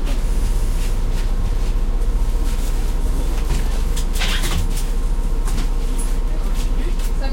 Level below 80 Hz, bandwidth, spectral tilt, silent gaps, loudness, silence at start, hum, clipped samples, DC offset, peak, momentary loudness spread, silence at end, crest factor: -18 dBFS; 16 kHz; -4.5 dB/octave; none; -24 LUFS; 0 s; none; under 0.1%; under 0.1%; -6 dBFS; 3 LU; 0 s; 10 dB